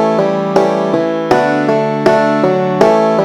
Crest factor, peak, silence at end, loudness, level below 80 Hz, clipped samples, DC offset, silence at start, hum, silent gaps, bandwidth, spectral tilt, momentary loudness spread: 12 dB; 0 dBFS; 0 s; -12 LUFS; -52 dBFS; 0.1%; under 0.1%; 0 s; none; none; 13 kHz; -6.5 dB/octave; 3 LU